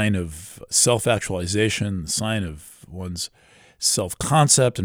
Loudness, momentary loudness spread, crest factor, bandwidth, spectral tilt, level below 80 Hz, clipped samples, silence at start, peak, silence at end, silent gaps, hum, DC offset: -21 LUFS; 17 LU; 20 dB; over 20 kHz; -3.5 dB/octave; -46 dBFS; under 0.1%; 0 s; -2 dBFS; 0 s; none; none; under 0.1%